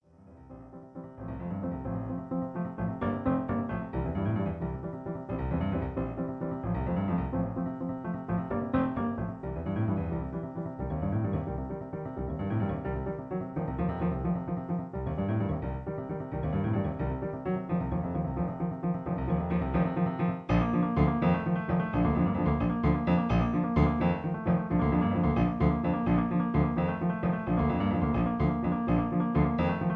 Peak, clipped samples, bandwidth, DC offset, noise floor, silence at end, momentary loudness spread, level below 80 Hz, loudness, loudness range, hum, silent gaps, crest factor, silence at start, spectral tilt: -10 dBFS; under 0.1%; 4.5 kHz; under 0.1%; -53 dBFS; 0 s; 9 LU; -42 dBFS; -30 LUFS; 6 LU; none; none; 18 dB; 0.3 s; -10.5 dB/octave